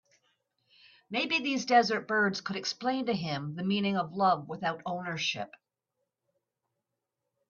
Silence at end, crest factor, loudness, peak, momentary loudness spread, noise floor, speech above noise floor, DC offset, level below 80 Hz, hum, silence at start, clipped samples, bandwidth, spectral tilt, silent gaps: 2 s; 22 dB; -30 LUFS; -10 dBFS; 10 LU; -86 dBFS; 56 dB; under 0.1%; -76 dBFS; none; 1.1 s; under 0.1%; 7.4 kHz; -4.5 dB/octave; none